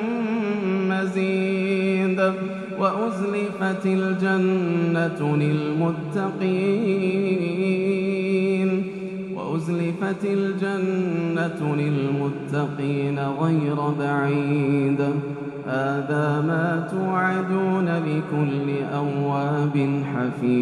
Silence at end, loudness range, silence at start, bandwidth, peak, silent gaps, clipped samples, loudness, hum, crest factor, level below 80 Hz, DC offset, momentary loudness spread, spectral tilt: 0 s; 2 LU; 0 s; 11 kHz; -8 dBFS; none; under 0.1%; -23 LUFS; none; 16 dB; -64 dBFS; under 0.1%; 4 LU; -8 dB/octave